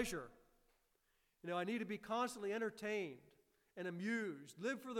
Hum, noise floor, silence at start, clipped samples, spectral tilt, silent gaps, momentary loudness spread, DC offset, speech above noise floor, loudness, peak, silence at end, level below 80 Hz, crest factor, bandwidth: none; -81 dBFS; 0 s; under 0.1%; -4.5 dB/octave; none; 11 LU; under 0.1%; 37 dB; -44 LUFS; -26 dBFS; 0 s; -72 dBFS; 18 dB; 17 kHz